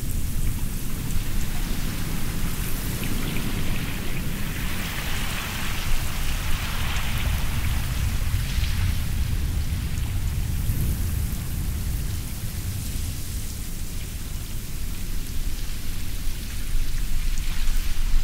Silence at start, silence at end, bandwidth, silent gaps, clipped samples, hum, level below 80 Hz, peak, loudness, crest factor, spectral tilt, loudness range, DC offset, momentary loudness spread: 0 s; 0 s; 16.5 kHz; none; under 0.1%; none; -26 dBFS; -8 dBFS; -29 LUFS; 14 dB; -4 dB/octave; 5 LU; under 0.1%; 7 LU